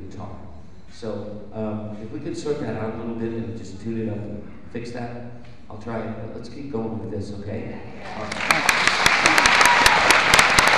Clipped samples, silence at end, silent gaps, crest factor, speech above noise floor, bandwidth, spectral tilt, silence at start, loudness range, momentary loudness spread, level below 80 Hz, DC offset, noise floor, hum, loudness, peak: under 0.1%; 0 s; none; 22 dB; 15 dB; 15 kHz; -2.5 dB/octave; 0 s; 16 LU; 22 LU; -46 dBFS; 1%; -44 dBFS; none; -18 LUFS; 0 dBFS